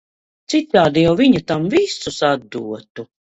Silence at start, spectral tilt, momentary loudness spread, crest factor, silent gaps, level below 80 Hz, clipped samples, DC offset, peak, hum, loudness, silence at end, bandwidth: 0.5 s; -5.5 dB/octave; 15 LU; 18 dB; 2.90-2.95 s; -50 dBFS; under 0.1%; under 0.1%; 0 dBFS; none; -16 LUFS; 0.2 s; 8.2 kHz